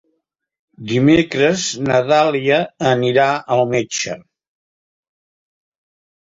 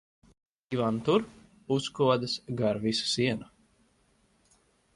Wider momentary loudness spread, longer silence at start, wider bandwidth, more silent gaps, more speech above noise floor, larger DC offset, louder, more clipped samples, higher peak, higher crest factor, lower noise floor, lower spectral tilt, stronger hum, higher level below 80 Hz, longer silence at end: about the same, 9 LU vs 7 LU; about the same, 0.8 s vs 0.7 s; second, 8 kHz vs 11.5 kHz; neither; first, 55 dB vs 40 dB; neither; first, -16 LUFS vs -29 LUFS; neither; first, -2 dBFS vs -12 dBFS; about the same, 16 dB vs 20 dB; about the same, -71 dBFS vs -68 dBFS; about the same, -5 dB/octave vs -5 dB/octave; neither; first, -54 dBFS vs -64 dBFS; first, 2.1 s vs 1.5 s